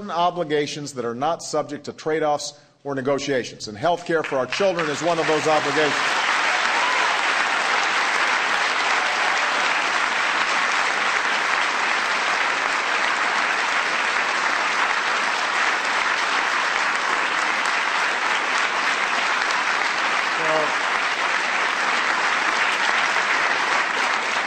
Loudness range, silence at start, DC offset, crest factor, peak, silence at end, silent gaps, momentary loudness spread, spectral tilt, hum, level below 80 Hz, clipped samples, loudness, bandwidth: 4 LU; 0 s; under 0.1%; 16 dB; -4 dBFS; 0 s; none; 5 LU; -1.5 dB/octave; none; -66 dBFS; under 0.1%; -20 LUFS; 13.5 kHz